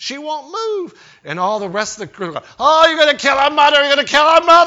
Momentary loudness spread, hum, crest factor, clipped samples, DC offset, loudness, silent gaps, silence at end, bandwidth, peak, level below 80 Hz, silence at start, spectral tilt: 15 LU; none; 14 dB; under 0.1%; under 0.1%; -13 LUFS; none; 0 s; 8.2 kHz; 0 dBFS; -54 dBFS; 0 s; -2 dB/octave